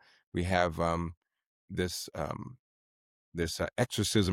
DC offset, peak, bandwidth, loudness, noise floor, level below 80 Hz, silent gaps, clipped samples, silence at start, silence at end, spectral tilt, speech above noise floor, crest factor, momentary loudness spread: under 0.1%; -12 dBFS; 16.5 kHz; -33 LUFS; under -90 dBFS; -52 dBFS; 1.17-1.21 s, 1.47-1.68 s, 2.59-3.32 s; under 0.1%; 0.35 s; 0 s; -4.5 dB/octave; over 59 dB; 22 dB; 13 LU